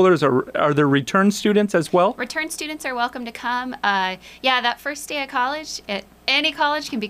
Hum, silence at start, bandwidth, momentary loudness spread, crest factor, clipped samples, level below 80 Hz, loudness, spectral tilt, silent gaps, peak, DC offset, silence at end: none; 0 s; 15.5 kHz; 9 LU; 14 dB; under 0.1%; -58 dBFS; -21 LUFS; -4.5 dB/octave; none; -6 dBFS; under 0.1%; 0 s